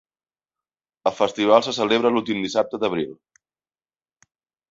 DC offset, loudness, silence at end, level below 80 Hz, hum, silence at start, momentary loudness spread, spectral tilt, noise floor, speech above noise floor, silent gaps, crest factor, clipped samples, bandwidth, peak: under 0.1%; -21 LUFS; 1.6 s; -66 dBFS; none; 1.05 s; 9 LU; -4.5 dB/octave; under -90 dBFS; over 69 dB; none; 22 dB; under 0.1%; 7.8 kHz; -2 dBFS